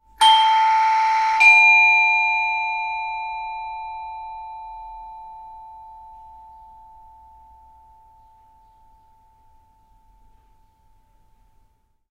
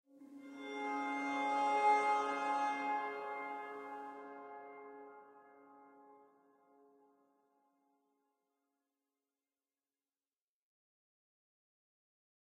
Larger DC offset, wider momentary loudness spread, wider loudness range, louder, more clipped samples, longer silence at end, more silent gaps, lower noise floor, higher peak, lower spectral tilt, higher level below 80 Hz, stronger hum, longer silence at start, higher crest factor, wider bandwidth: neither; first, 27 LU vs 22 LU; first, 25 LU vs 21 LU; first, -15 LUFS vs -37 LUFS; neither; second, 6.05 s vs 6.3 s; neither; second, -62 dBFS vs under -90 dBFS; first, -2 dBFS vs -20 dBFS; second, 2 dB/octave vs -3 dB/octave; first, -56 dBFS vs under -90 dBFS; neither; about the same, 0.2 s vs 0.15 s; about the same, 20 dB vs 22 dB; first, 12.5 kHz vs 10 kHz